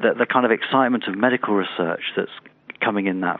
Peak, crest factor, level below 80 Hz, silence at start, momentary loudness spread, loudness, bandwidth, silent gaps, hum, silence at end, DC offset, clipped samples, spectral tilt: -2 dBFS; 20 dB; -72 dBFS; 0 s; 10 LU; -21 LUFS; 4.3 kHz; none; none; 0 s; under 0.1%; under 0.1%; -3 dB/octave